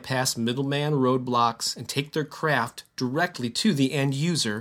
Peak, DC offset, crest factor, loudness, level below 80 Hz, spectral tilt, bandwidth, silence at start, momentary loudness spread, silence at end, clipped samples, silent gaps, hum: -8 dBFS; under 0.1%; 18 dB; -25 LUFS; -66 dBFS; -4.5 dB/octave; 16.5 kHz; 0 s; 6 LU; 0 s; under 0.1%; none; none